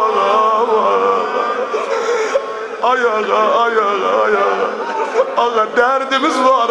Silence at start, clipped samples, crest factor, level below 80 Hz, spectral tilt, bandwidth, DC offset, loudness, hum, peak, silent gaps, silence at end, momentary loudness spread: 0 s; under 0.1%; 14 dB; -60 dBFS; -3 dB/octave; 10.5 kHz; under 0.1%; -15 LUFS; none; 0 dBFS; none; 0 s; 6 LU